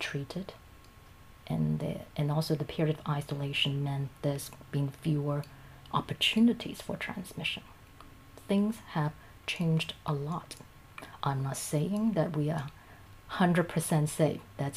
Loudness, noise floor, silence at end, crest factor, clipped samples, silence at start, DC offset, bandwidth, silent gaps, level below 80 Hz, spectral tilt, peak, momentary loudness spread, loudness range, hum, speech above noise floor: -32 LUFS; -54 dBFS; 0 s; 18 dB; under 0.1%; 0 s; under 0.1%; 15.5 kHz; none; -58 dBFS; -5.5 dB/octave; -14 dBFS; 14 LU; 3 LU; none; 23 dB